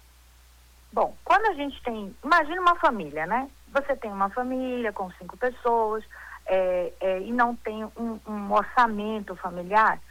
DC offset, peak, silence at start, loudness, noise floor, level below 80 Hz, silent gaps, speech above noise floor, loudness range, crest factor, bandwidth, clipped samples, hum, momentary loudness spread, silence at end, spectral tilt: under 0.1%; -8 dBFS; 0.95 s; -26 LUFS; -54 dBFS; -52 dBFS; none; 28 dB; 3 LU; 18 dB; 19 kHz; under 0.1%; none; 12 LU; 0.05 s; -5.5 dB/octave